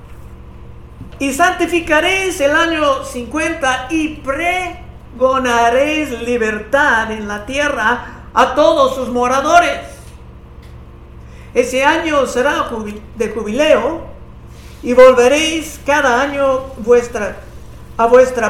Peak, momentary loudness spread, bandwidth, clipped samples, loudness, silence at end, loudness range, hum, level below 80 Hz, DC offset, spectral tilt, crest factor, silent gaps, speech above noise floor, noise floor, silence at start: 0 dBFS; 11 LU; 15.5 kHz; 0.3%; -14 LUFS; 0 s; 4 LU; none; -36 dBFS; under 0.1%; -3.5 dB/octave; 14 dB; none; 22 dB; -35 dBFS; 0 s